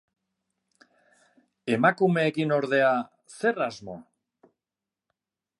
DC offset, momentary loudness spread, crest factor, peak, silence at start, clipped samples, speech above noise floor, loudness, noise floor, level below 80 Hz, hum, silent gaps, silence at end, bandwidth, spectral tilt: under 0.1%; 19 LU; 22 dB; -8 dBFS; 1.65 s; under 0.1%; 65 dB; -25 LUFS; -89 dBFS; -72 dBFS; none; none; 1.6 s; 11.5 kHz; -6.5 dB/octave